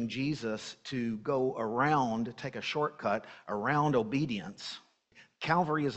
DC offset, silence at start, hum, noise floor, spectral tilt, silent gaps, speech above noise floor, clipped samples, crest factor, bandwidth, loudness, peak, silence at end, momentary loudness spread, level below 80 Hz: under 0.1%; 0 s; none; -62 dBFS; -6 dB/octave; none; 30 dB; under 0.1%; 18 dB; 8.4 kHz; -32 LUFS; -14 dBFS; 0 s; 11 LU; -66 dBFS